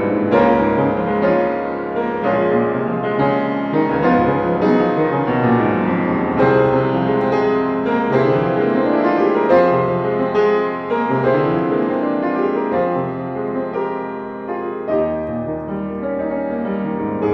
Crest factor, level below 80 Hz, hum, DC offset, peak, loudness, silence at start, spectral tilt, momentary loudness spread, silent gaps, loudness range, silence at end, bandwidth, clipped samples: 16 dB; -46 dBFS; none; under 0.1%; -2 dBFS; -18 LUFS; 0 s; -9 dB/octave; 8 LU; none; 6 LU; 0 s; 6.2 kHz; under 0.1%